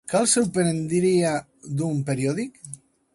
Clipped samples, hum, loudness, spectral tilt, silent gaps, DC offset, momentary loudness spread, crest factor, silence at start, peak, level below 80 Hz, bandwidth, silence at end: under 0.1%; none; -23 LUFS; -5 dB/octave; none; under 0.1%; 16 LU; 18 dB; 0.05 s; -6 dBFS; -60 dBFS; 11.5 kHz; 0.4 s